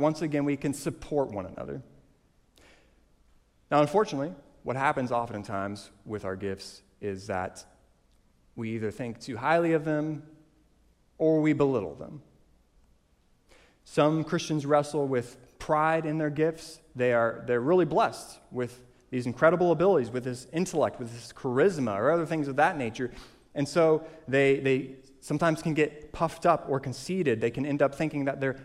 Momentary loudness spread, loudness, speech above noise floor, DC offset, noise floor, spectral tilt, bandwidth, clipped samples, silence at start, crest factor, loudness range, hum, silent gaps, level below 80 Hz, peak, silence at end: 15 LU; -28 LUFS; 38 dB; under 0.1%; -66 dBFS; -6.5 dB/octave; 14.5 kHz; under 0.1%; 0 s; 20 dB; 6 LU; none; none; -60 dBFS; -8 dBFS; 0 s